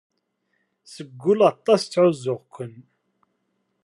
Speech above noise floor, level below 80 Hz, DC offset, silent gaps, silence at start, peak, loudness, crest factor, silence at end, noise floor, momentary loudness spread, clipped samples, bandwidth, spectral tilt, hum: 52 dB; -76 dBFS; under 0.1%; none; 0.9 s; -4 dBFS; -21 LUFS; 20 dB; 1.15 s; -73 dBFS; 20 LU; under 0.1%; 11.5 kHz; -6 dB/octave; none